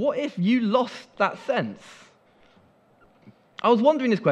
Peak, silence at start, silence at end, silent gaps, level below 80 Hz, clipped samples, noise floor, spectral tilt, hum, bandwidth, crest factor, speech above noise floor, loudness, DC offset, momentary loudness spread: -6 dBFS; 0 s; 0 s; none; -74 dBFS; under 0.1%; -58 dBFS; -7 dB/octave; none; 9.2 kHz; 18 dB; 36 dB; -23 LUFS; under 0.1%; 13 LU